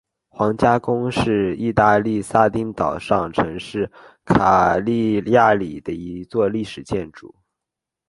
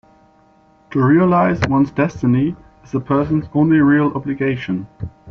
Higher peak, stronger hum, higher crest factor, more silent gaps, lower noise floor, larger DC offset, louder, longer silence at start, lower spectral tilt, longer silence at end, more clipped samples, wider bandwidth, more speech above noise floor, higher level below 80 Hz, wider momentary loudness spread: first, 0 dBFS vs -4 dBFS; neither; first, 20 dB vs 14 dB; neither; first, -85 dBFS vs -52 dBFS; neither; about the same, -19 LUFS vs -17 LUFS; second, 0.35 s vs 0.9 s; about the same, -7 dB/octave vs -7.5 dB/octave; first, 0.8 s vs 0 s; neither; first, 11.5 kHz vs 6.8 kHz; first, 66 dB vs 36 dB; about the same, -44 dBFS vs -46 dBFS; about the same, 12 LU vs 13 LU